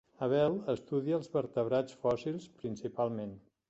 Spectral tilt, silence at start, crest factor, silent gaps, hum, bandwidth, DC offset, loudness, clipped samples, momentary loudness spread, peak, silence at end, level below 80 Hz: -7.5 dB/octave; 0.2 s; 16 dB; none; none; 8.2 kHz; under 0.1%; -34 LUFS; under 0.1%; 11 LU; -18 dBFS; 0.3 s; -68 dBFS